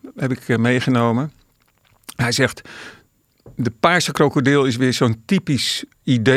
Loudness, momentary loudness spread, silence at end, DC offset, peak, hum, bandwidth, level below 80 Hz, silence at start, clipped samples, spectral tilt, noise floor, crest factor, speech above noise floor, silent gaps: -18 LUFS; 18 LU; 0 s; under 0.1%; -2 dBFS; none; 15.5 kHz; -56 dBFS; 0.05 s; under 0.1%; -5 dB/octave; -59 dBFS; 18 dB; 41 dB; none